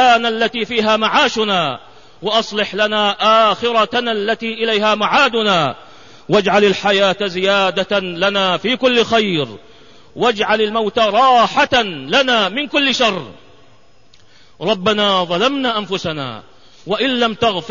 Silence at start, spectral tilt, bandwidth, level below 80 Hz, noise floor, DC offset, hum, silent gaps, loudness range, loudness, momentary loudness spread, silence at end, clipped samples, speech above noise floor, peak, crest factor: 0 s; -4 dB/octave; 7.4 kHz; -54 dBFS; -51 dBFS; 0.6%; none; none; 3 LU; -15 LUFS; 8 LU; 0 s; under 0.1%; 36 dB; -2 dBFS; 14 dB